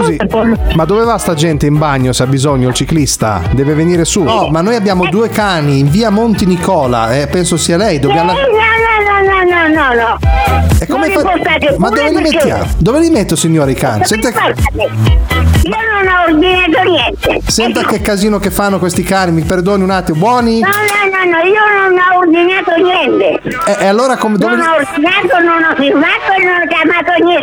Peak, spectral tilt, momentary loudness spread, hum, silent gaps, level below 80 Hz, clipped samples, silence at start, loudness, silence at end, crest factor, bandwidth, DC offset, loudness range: 0 dBFS; -5 dB/octave; 4 LU; none; none; -22 dBFS; under 0.1%; 0 s; -10 LUFS; 0 s; 8 dB; over 20 kHz; under 0.1%; 2 LU